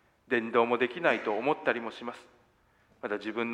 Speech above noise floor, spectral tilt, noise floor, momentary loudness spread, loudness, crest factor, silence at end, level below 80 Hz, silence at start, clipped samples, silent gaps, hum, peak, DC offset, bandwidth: 36 dB; -6 dB/octave; -66 dBFS; 15 LU; -30 LUFS; 22 dB; 0 s; -76 dBFS; 0.3 s; under 0.1%; none; none; -10 dBFS; under 0.1%; 9.8 kHz